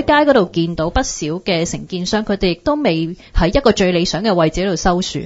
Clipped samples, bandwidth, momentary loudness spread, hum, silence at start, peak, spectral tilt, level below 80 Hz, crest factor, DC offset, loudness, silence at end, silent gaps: under 0.1%; 8 kHz; 7 LU; none; 0 s; 0 dBFS; -5 dB/octave; -28 dBFS; 16 dB; under 0.1%; -16 LUFS; 0 s; none